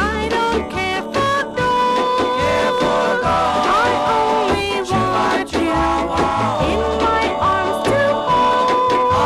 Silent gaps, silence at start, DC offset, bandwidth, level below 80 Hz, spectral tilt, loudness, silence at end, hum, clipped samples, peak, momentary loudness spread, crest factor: none; 0 s; under 0.1%; 14 kHz; -36 dBFS; -5 dB/octave; -17 LUFS; 0 s; none; under 0.1%; -6 dBFS; 3 LU; 12 dB